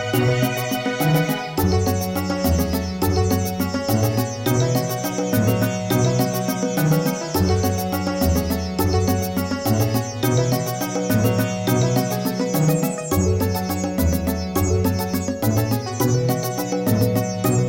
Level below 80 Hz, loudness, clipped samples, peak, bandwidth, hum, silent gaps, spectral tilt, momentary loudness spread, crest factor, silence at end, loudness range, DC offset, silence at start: -36 dBFS; -21 LUFS; under 0.1%; -6 dBFS; 17 kHz; none; none; -5.5 dB/octave; 4 LU; 14 dB; 0 s; 1 LU; 0.1%; 0 s